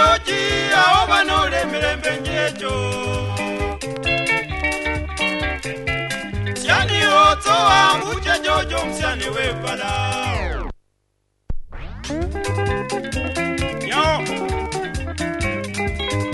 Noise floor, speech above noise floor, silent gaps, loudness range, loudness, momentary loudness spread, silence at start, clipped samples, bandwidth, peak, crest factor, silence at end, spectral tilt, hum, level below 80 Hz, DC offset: -68 dBFS; 46 dB; none; 9 LU; -19 LUFS; 12 LU; 0 s; under 0.1%; 12 kHz; -2 dBFS; 18 dB; 0 s; -4 dB/octave; none; -32 dBFS; under 0.1%